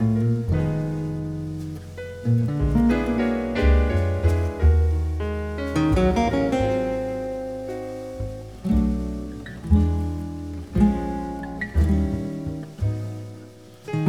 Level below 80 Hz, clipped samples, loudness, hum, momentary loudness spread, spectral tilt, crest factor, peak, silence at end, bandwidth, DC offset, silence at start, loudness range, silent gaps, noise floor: -28 dBFS; under 0.1%; -24 LUFS; none; 13 LU; -8.5 dB/octave; 16 dB; -6 dBFS; 0 s; 11.5 kHz; 0.1%; 0 s; 4 LU; none; -44 dBFS